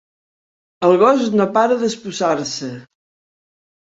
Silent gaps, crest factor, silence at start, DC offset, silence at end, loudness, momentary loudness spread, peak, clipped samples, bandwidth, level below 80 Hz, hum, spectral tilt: none; 18 dB; 0.8 s; under 0.1%; 1.15 s; -17 LUFS; 13 LU; -2 dBFS; under 0.1%; 8 kHz; -64 dBFS; none; -5 dB/octave